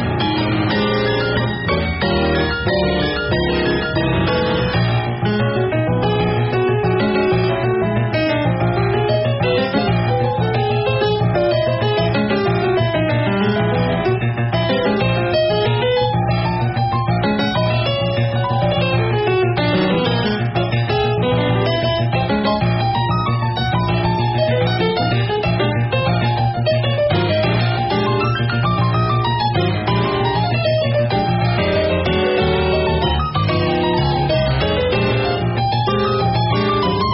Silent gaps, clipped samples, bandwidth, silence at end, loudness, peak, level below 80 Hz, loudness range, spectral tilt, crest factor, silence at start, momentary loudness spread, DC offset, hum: none; under 0.1%; 5.8 kHz; 0 s; -17 LUFS; -6 dBFS; -34 dBFS; 1 LU; -5 dB/octave; 12 dB; 0 s; 2 LU; under 0.1%; none